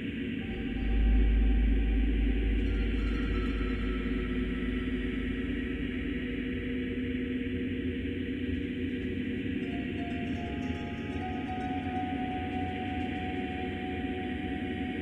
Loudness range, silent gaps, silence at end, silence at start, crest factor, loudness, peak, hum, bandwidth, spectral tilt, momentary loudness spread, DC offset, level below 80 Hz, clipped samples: 4 LU; none; 0 s; 0 s; 14 dB; -33 LUFS; -16 dBFS; none; 4.5 kHz; -8 dB/octave; 6 LU; under 0.1%; -34 dBFS; under 0.1%